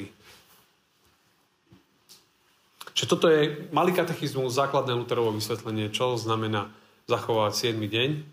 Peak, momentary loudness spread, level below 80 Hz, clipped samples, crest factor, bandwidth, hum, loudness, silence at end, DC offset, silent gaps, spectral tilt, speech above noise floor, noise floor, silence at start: -8 dBFS; 8 LU; -72 dBFS; under 0.1%; 20 dB; 16 kHz; none; -26 LUFS; 0 s; under 0.1%; none; -5 dB/octave; 41 dB; -67 dBFS; 0 s